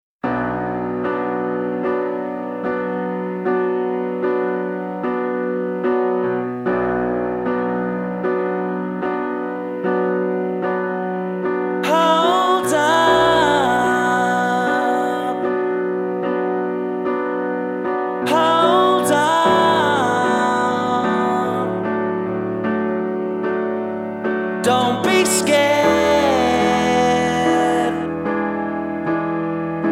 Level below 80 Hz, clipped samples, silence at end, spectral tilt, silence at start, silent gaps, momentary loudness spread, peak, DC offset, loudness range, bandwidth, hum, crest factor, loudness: -52 dBFS; under 0.1%; 0 s; -4.5 dB/octave; 0.25 s; none; 8 LU; -2 dBFS; under 0.1%; 6 LU; 16 kHz; none; 16 dB; -19 LUFS